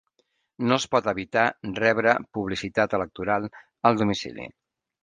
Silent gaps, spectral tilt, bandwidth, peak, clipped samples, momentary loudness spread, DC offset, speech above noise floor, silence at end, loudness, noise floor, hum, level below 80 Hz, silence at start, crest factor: none; -5 dB/octave; 10 kHz; -2 dBFS; under 0.1%; 9 LU; under 0.1%; 47 dB; 0.55 s; -24 LUFS; -72 dBFS; none; -56 dBFS; 0.6 s; 22 dB